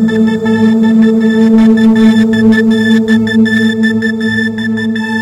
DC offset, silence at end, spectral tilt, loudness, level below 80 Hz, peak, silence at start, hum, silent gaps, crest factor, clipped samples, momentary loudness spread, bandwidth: under 0.1%; 0 s; -6.5 dB/octave; -9 LUFS; -46 dBFS; 0 dBFS; 0 s; none; none; 8 dB; 0.2%; 7 LU; 9.2 kHz